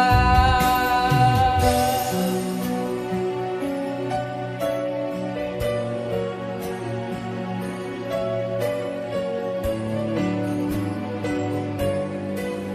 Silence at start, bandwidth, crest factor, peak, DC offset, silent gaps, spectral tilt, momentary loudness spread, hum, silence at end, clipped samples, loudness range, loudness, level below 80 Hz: 0 s; 14.5 kHz; 20 dB; -4 dBFS; under 0.1%; none; -6 dB/octave; 11 LU; none; 0 s; under 0.1%; 7 LU; -24 LUFS; -36 dBFS